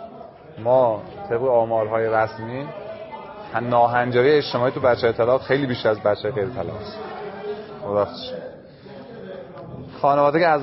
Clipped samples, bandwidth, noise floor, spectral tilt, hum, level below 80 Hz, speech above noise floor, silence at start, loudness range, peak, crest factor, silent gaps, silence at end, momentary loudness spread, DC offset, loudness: under 0.1%; 6 kHz; -41 dBFS; -9.5 dB/octave; none; -54 dBFS; 21 dB; 0 s; 9 LU; -4 dBFS; 18 dB; none; 0 s; 19 LU; under 0.1%; -21 LUFS